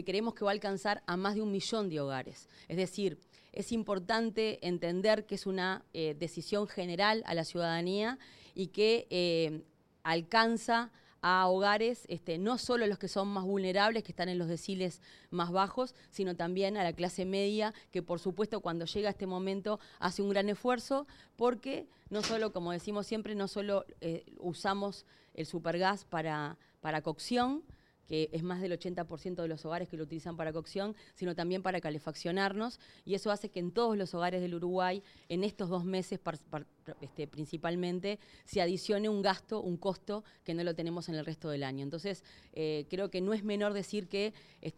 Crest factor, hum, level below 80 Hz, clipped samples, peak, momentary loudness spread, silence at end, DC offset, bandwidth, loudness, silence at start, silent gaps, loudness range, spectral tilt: 22 dB; none; -68 dBFS; under 0.1%; -12 dBFS; 11 LU; 0.05 s; under 0.1%; 13.5 kHz; -35 LUFS; 0 s; none; 6 LU; -5.5 dB/octave